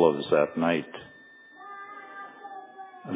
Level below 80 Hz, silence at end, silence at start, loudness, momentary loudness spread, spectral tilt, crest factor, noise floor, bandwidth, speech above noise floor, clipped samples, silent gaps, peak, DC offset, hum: -66 dBFS; 0 s; 0 s; -25 LUFS; 23 LU; -10 dB/octave; 22 dB; -52 dBFS; 4 kHz; 27 dB; under 0.1%; none; -8 dBFS; under 0.1%; none